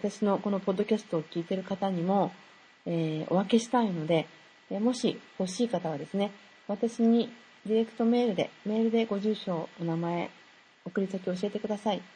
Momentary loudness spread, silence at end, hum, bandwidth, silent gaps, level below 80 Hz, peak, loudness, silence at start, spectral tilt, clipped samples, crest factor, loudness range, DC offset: 9 LU; 0.1 s; none; 9.8 kHz; none; -76 dBFS; -12 dBFS; -30 LUFS; 0 s; -6.5 dB/octave; under 0.1%; 18 dB; 3 LU; under 0.1%